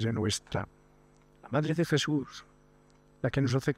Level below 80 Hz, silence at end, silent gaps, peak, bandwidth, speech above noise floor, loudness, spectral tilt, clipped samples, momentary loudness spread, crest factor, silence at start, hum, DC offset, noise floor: -58 dBFS; 0.05 s; none; -12 dBFS; 15.5 kHz; 31 dB; -31 LUFS; -5.5 dB/octave; under 0.1%; 14 LU; 20 dB; 0 s; 50 Hz at -45 dBFS; under 0.1%; -61 dBFS